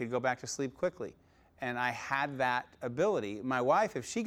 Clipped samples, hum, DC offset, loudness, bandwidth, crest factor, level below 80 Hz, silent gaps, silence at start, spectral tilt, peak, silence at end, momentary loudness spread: under 0.1%; none; under 0.1%; -33 LUFS; 16 kHz; 18 dB; -70 dBFS; none; 0 s; -4.5 dB/octave; -16 dBFS; 0 s; 10 LU